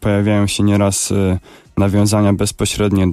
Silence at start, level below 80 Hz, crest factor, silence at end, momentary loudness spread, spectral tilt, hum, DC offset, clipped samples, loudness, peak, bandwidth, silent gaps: 0 s; -36 dBFS; 10 dB; 0 s; 5 LU; -5.5 dB/octave; none; under 0.1%; under 0.1%; -15 LUFS; -4 dBFS; 15 kHz; none